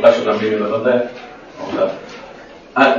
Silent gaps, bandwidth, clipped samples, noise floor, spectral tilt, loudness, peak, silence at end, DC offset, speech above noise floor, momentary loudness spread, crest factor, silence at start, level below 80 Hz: none; 7.4 kHz; under 0.1%; -38 dBFS; -5.5 dB/octave; -18 LUFS; 0 dBFS; 0 s; under 0.1%; 20 dB; 20 LU; 16 dB; 0 s; -56 dBFS